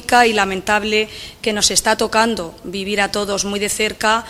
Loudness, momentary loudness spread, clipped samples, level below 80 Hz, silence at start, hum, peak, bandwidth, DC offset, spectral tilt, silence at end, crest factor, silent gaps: -17 LUFS; 11 LU; under 0.1%; -44 dBFS; 0 s; none; 0 dBFS; 16 kHz; under 0.1%; -2 dB/octave; 0 s; 18 dB; none